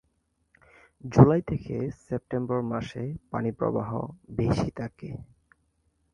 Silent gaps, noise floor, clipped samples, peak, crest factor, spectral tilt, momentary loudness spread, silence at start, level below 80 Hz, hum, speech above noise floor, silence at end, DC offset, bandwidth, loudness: none; -73 dBFS; under 0.1%; 0 dBFS; 26 dB; -9 dB/octave; 18 LU; 1.05 s; -48 dBFS; none; 47 dB; 0.9 s; under 0.1%; 9.8 kHz; -27 LUFS